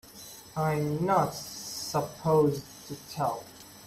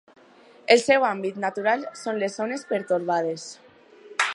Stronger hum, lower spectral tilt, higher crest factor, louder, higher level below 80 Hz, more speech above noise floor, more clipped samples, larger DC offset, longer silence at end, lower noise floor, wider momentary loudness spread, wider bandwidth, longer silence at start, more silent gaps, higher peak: neither; first, -5.5 dB/octave vs -3.5 dB/octave; second, 18 dB vs 24 dB; second, -29 LUFS vs -24 LUFS; first, -62 dBFS vs -72 dBFS; second, 20 dB vs 29 dB; neither; neither; about the same, 0 s vs 0 s; second, -48 dBFS vs -52 dBFS; first, 18 LU vs 13 LU; first, 15 kHz vs 11.5 kHz; second, 0.05 s vs 0.7 s; neither; second, -12 dBFS vs 0 dBFS